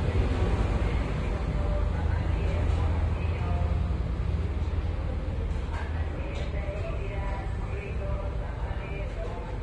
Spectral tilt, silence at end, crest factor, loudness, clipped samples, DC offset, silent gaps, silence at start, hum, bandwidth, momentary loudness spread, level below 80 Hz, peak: -8 dB/octave; 0 s; 14 dB; -31 LUFS; under 0.1%; under 0.1%; none; 0 s; none; 9 kHz; 6 LU; -30 dBFS; -14 dBFS